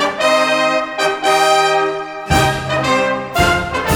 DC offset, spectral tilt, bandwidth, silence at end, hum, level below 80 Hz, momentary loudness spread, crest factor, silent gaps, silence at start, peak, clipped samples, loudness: under 0.1%; -4 dB/octave; 19 kHz; 0 s; none; -34 dBFS; 5 LU; 14 dB; none; 0 s; -2 dBFS; under 0.1%; -15 LUFS